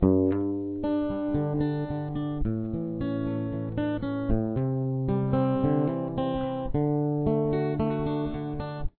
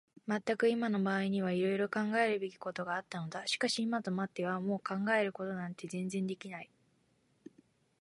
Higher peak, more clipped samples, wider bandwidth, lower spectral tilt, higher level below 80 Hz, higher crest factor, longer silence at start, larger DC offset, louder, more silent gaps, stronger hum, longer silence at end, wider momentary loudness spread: first, -8 dBFS vs -18 dBFS; neither; second, 4.4 kHz vs 11.5 kHz; first, -12.5 dB/octave vs -5.5 dB/octave; first, -40 dBFS vs -80 dBFS; about the same, 18 dB vs 18 dB; second, 0 s vs 0.25 s; neither; first, -28 LUFS vs -35 LUFS; neither; neither; second, 0.1 s vs 1.35 s; second, 6 LU vs 10 LU